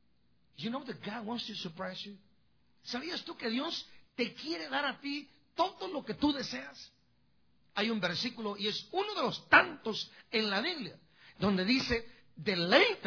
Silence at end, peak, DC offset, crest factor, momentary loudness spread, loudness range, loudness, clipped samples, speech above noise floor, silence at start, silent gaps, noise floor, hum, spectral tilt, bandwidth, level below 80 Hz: 0 s; -8 dBFS; under 0.1%; 26 dB; 15 LU; 8 LU; -33 LUFS; under 0.1%; 40 dB; 0.6 s; none; -74 dBFS; none; -4.5 dB/octave; 5.4 kHz; -62 dBFS